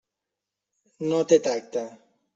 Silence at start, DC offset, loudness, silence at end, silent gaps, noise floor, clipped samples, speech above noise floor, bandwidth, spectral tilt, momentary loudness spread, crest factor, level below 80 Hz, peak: 1 s; under 0.1%; -24 LUFS; 0.4 s; none; -86 dBFS; under 0.1%; 62 dB; 7.8 kHz; -5 dB/octave; 12 LU; 22 dB; -74 dBFS; -6 dBFS